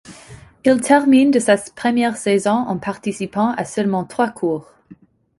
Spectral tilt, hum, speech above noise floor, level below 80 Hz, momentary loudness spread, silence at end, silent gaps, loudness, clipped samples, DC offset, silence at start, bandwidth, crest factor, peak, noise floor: -5 dB/octave; none; 30 dB; -58 dBFS; 10 LU; 0.45 s; none; -18 LUFS; under 0.1%; under 0.1%; 0.1 s; 11.5 kHz; 16 dB; -2 dBFS; -47 dBFS